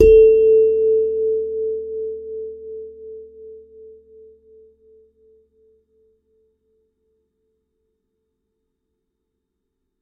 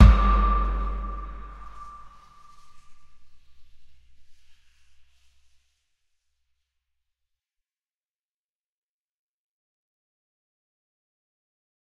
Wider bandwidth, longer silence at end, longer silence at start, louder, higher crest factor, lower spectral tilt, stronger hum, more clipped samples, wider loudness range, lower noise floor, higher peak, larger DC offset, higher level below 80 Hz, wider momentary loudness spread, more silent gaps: second, 3.4 kHz vs 5.4 kHz; second, 6.45 s vs 7.65 s; about the same, 0 s vs 0 s; first, -17 LUFS vs -24 LUFS; second, 20 dB vs 26 dB; about the same, -8.5 dB/octave vs -8 dB/octave; neither; neither; about the same, 26 LU vs 24 LU; second, -76 dBFS vs under -90 dBFS; about the same, 0 dBFS vs 0 dBFS; neither; second, -40 dBFS vs -30 dBFS; first, 27 LU vs 23 LU; neither